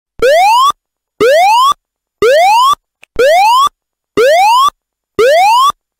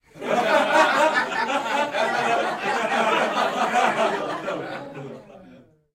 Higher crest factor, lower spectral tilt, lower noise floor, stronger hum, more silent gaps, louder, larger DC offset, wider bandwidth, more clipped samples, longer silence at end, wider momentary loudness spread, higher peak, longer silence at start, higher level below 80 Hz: second, 8 dB vs 18 dB; second, -1.5 dB/octave vs -3 dB/octave; about the same, -51 dBFS vs -50 dBFS; neither; neither; first, -9 LUFS vs -22 LUFS; neither; about the same, 16 kHz vs 16 kHz; neither; about the same, 0.3 s vs 0.4 s; second, 10 LU vs 15 LU; first, 0 dBFS vs -4 dBFS; about the same, 0.2 s vs 0.15 s; first, -44 dBFS vs -66 dBFS